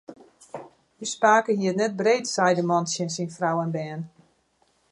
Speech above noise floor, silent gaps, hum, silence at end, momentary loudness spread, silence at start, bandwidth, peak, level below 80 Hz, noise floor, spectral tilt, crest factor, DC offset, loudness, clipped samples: 43 dB; none; none; 0.85 s; 22 LU; 0.1 s; 11.5 kHz; -4 dBFS; -74 dBFS; -67 dBFS; -4.5 dB/octave; 20 dB; under 0.1%; -24 LUFS; under 0.1%